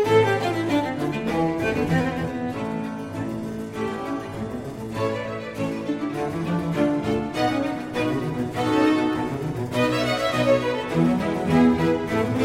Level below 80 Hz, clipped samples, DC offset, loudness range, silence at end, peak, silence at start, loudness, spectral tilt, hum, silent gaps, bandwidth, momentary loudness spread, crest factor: -48 dBFS; under 0.1%; under 0.1%; 7 LU; 0 s; -6 dBFS; 0 s; -24 LUFS; -6.5 dB/octave; none; none; 16 kHz; 10 LU; 16 dB